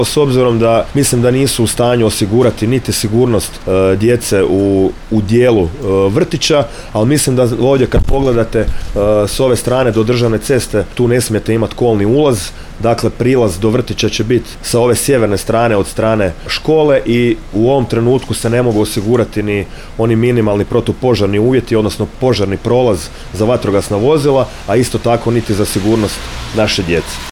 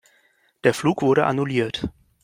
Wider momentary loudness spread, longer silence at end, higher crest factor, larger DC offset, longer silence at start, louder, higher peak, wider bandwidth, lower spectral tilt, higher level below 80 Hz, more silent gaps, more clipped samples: second, 5 LU vs 9 LU; second, 0 s vs 0.35 s; second, 10 dB vs 20 dB; neither; second, 0 s vs 0.65 s; first, -13 LUFS vs -21 LUFS; about the same, -2 dBFS vs -4 dBFS; first, 18.5 kHz vs 16 kHz; about the same, -5.5 dB/octave vs -6 dB/octave; first, -28 dBFS vs -52 dBFS; neither; neither